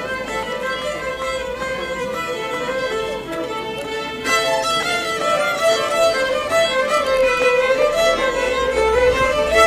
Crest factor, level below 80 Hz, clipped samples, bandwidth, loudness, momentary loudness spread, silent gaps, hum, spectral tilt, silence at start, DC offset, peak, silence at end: 18 dB; -40 dBFS; under 0.1%; 15.5 kHz; -19 LUFS; 9 LU; none; none; -2.5 dB/octave; 0 s; under 0.1%; -2 dBFS; 0 s